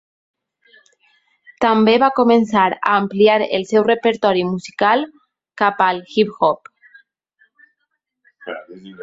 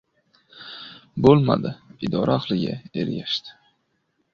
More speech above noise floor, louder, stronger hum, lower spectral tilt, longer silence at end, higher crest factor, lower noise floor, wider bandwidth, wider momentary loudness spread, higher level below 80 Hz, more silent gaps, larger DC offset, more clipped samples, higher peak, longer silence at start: first, 58 dB vs 50 dB; first, -16 LUFS vs -22 LUFS; neither; second, -6 dB/octave vs -8 dB/octave; second, 0 s vs 0.8 s; second, 16 dB vs 22 dB; about the same, -73 dBFS vs -71 dBFS; first, 7.8 kHz vs 7 kHz; second, 16 LU vs 21 LU; second, -62 dBFS vs -52 dBFS; neither; neither; neither; about the same, -2 dBFS vs -2 dBFS; first, 1.6 s vs 0.55 s